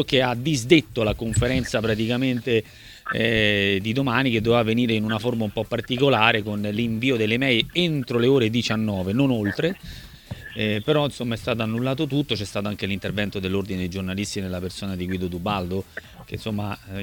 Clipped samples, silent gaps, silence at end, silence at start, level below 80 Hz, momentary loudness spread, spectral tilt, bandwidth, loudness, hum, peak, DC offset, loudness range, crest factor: under 0.1%; none; 0 s; 0 s; -46 dBFS; 11 LU; -5.5 dB/octave; 19 kHz; -23 LUFS; none; -2 dBFS; under 0.1%; 6 LU; 22 dB